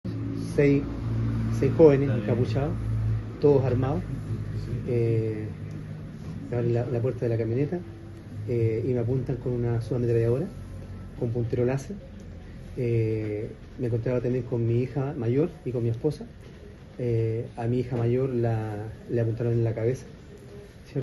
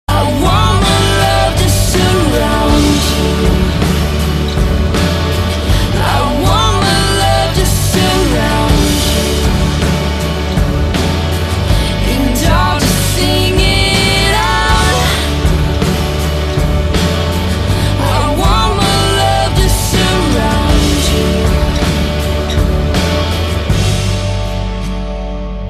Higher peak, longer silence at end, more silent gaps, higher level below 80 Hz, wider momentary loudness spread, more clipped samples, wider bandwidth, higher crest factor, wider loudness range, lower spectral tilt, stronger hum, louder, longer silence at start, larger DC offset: second, -4 dBFS vs 0 dBFS; about the same, 0 s vs 0 s; neither; second, -44 dBFS vs -16 dBFS; first, 17 LU vs 5 LU; neither; second, 11.5 kHz vs 14 kHz; first, 22 dB vs 12 dB; first, 6 LU vs 3 LU; first, -9 dB/octave vs -4.5 dB/octave; neither; second, -27 LUFS vs -12 LUFS; about the same, 0.05 s vs 0.1 s; neither